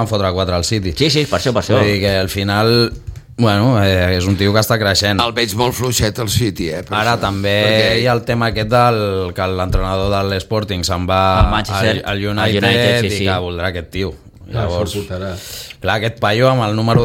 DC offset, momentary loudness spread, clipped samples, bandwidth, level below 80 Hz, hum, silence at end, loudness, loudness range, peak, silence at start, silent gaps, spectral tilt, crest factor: under 0.1%; 9 LU; under 0.1%; 17 kHz; -30 dBFS; none; 0 s; -15 LUFS; 3 LU; 0 dBFS; 0 s; none; -5 dB/octave; 16 dB